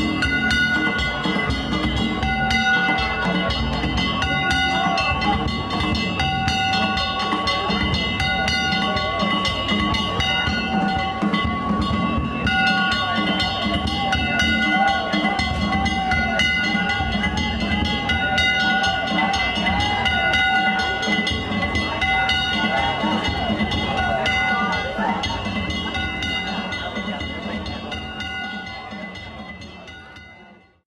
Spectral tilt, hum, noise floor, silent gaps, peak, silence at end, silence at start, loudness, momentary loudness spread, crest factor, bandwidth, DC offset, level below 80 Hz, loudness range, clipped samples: -4.5 dB/octave; none; -48 dBFS; none; -8 dBFS; 0.4 s; 0 s; -20 LUFS; 9 LU; 14 dB; 13 kHz; under 0.1%; -34 dBFS; 6 LU; under 0.1%